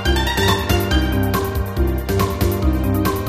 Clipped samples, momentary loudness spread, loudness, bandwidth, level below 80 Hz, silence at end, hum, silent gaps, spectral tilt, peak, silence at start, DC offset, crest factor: under 0.1%; 4 LU; -19 LUFS; 15.5 kHz; -22 dBFS; 0 s; none; none; -5.5 dB/octave; -4 dBFS; 0 s; under 0.1%; 14 dB